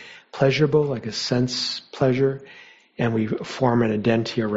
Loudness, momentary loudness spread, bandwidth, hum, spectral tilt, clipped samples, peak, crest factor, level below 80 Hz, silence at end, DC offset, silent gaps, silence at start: -22 LUFS; 7 LU; 8 kHz; none; -6 dB/octave; under 0.1%; -4 dBFS; 18 dB; -54 dBFS; 0 s; under 0.1%; none; 0 s